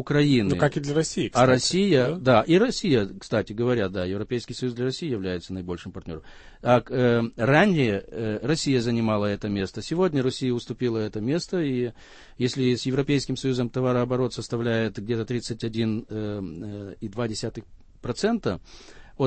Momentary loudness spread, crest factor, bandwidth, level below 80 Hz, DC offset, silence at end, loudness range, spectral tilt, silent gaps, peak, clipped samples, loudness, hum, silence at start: 13 LU; 20 dB; 8.8 kHz; -50 dBFS; under 0.1%; 0 s; 7 LU; -6 dB/octave; none; -6 dBFS; under 0.1%; -25 LUFS; none; 0 s